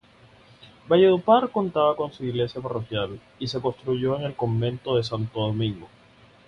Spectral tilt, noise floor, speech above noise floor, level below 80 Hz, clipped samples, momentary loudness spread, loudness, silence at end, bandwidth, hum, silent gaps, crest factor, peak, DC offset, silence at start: -7.5 dB/octave; -54 dBFS; 30 dB; -56 dBFS; under 0.1%; 11 LU; -24 LUFS; 0.6 s; 7.2 kHz; none; none; 20 dB; -6 dBFS; under 0.1%; 0.85 s